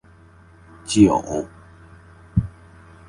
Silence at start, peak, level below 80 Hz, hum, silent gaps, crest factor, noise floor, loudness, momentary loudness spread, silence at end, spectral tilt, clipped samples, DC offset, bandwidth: 0.85 s; -2 dBFS; -40 dBFS; none; none; 22 dB; -49 dBFS; -20 LUFS; 21 LU; 0.6 s; -6 dB/octave; under 0.1%; under 0.1%; 11.5 kHz